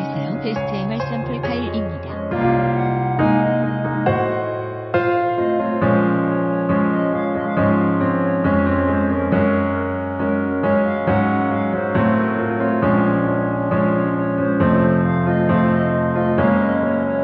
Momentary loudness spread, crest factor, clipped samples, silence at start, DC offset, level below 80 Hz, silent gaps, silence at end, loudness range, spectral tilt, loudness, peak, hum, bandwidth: 7 LU; 14 dB; under 0.1%; 0 s; under 0.1%; -44 dBFS; none; 0 s; 2 LU; -10.5 dB/octave; -19 LUFS; -4 dBFS; none; 5.8 kHz